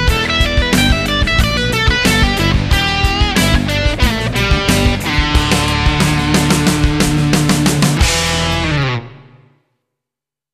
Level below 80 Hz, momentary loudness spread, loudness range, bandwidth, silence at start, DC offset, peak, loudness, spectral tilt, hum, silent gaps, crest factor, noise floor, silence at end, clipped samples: -20 dBFS; 3 LU; 2 LU; 14 kHz; 0 s; under 0.1%; 0 dBFS; -13 LUFS; -4.5 dB/octave; none; none; 14 dB; -85 dBFS; 1.3 s; under 0.1%